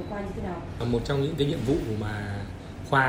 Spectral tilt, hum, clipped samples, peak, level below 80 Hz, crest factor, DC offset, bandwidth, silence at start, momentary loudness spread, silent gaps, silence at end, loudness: -6.5 dB/octave; none; under 0.1%; -10 dBFS; -42 dBFS; 18 dB; under 0.1%; 16 kHz; 0 s; 9 LU; none; 0 s; -29 LUFS